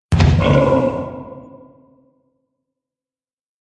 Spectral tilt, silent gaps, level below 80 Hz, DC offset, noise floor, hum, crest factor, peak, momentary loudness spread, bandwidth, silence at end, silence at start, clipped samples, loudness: -7.5 dB/octave; none; -32 dBFS; under 0.1%; under -90 dBFS; none; 18 dB; -2 dBFS; 22 LU; 10.5 kHz; 2.2 s; 0.1 s; under 0.1%; -15 LUFS